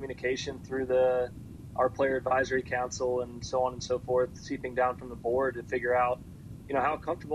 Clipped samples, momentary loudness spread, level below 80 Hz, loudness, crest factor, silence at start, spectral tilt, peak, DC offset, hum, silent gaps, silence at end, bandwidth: under 0.1%; 9 LU; -54 dBFS; -30 LUFS; 16 dB; 0 s; -5 dB/octave; -14 dBFS; under 0.1%; none; none; 0 s; 12.5 kHz